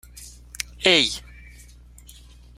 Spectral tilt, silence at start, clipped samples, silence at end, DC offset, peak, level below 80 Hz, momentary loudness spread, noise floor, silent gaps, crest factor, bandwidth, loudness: -2 dB/octave; 0.15 s; under 0.1%; 1.35 s; under 0.1%; -2 dBFS; -46 dBFS; 25 LU; -47 dBFS; none; 26 dB; 16 kHz; -20 LUFS